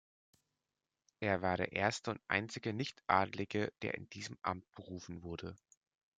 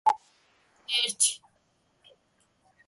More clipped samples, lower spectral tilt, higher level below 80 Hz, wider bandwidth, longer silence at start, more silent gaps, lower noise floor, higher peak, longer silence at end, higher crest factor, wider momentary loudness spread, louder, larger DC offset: neither; first, -5 dB/octave vs 3 dB/octave; first, -72 dBFS vs -78 dBFS; second, 9.4 kHz vs 12 kHz; first, 1.2 s vs 0.05 s; neither; first, under -90 dBFS vs -70 dBFS; second, -14 dBFS vs -10 dBFS; second, 0.6 s vs 1.5 s; about the same, 26 dB vs 22 dB; second, 14 LU vs 19 LU; second, -38 LUFS vs -26 LUFS; neither